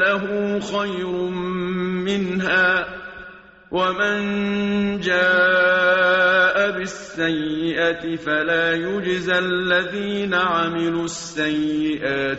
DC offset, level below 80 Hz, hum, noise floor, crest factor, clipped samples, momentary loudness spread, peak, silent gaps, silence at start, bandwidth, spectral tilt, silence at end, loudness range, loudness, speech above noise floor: under 0.1%; -52 dBFS; none; -43 dBFS; 14 dB; under 0.1%; 9 LU; -6 dBFS; none; 0 s; 8 kHz; -2.5 dB/octave; 0 s; 4 LU; -20 LUFS; 22 dB